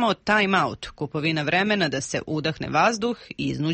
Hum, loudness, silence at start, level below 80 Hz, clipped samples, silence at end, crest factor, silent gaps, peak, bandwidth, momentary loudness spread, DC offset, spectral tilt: none; -23 LUFS; 0 s; -54 dBFS; under 0.1%; 0 s; 16 dB; none; -8 dBFS; 8.8 kHz; 9 LU; under 0.1%; -4.5 dB/octave